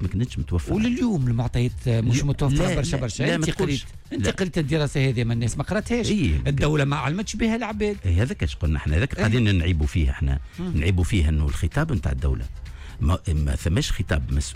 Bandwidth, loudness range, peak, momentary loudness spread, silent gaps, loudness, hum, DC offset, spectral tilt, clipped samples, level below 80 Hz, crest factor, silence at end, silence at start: 13.5 kHz; 2 LU; -10 dBFS; 5 LU; none; -24 LUFS; none; under 0.1%; -6 dB/octave; under 0.1%; -30 dBFS; 12 dB; 0 s; 0 s